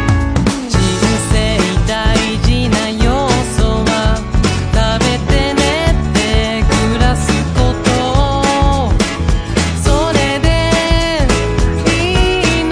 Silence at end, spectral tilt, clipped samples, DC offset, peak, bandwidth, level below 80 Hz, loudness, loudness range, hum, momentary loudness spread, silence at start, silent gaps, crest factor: 0 s; -5 dB/octave; under 0.1%; under 0.1%; 0 dBFS; 10.5 kHz; -18 dBFS; -13 LUFS; 1 LU; none; 2 LU; 0 s; none; 12 dB